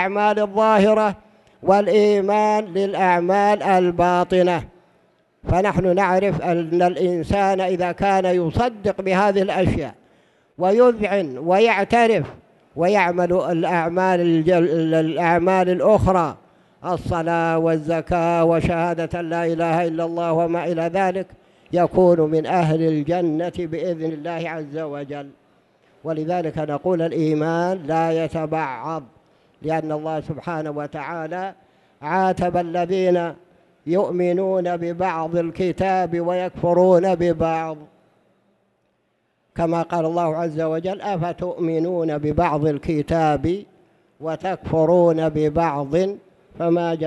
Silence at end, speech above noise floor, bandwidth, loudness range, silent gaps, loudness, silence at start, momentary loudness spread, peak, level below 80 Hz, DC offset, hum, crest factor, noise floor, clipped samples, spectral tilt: 0 s; 48 dB; 11.5 kHz; 7 LU; none; -20 LUFS; 0 s; 11 LU; -4 dBFS; -46 dBFS; under 0.1%; none; 16 dB; -68 dBFS; under 0.1%; -7.5 dB/octave